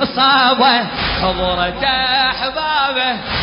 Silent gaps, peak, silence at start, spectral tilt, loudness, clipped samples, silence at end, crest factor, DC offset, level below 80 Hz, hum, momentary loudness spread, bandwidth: none; -2 dBFS; 0 s; -8 dB/octave; -14 LUFS; under 0.1%; 0 s; 14 dB; under 0.1%; -34 dBFS; none; 7 LU; 5.4 kHz